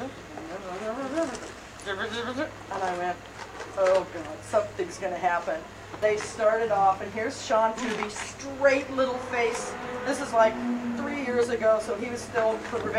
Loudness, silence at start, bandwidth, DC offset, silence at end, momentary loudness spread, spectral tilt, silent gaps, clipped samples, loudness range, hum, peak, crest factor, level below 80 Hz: -28 LUFS; 0 s; 15 kHz; under 0.1%; 0 s; 13 LU; -4 dB/octave; none; under 0.1%; 4 LU; none; -8 dBFS; 18 dB; -56 dBFS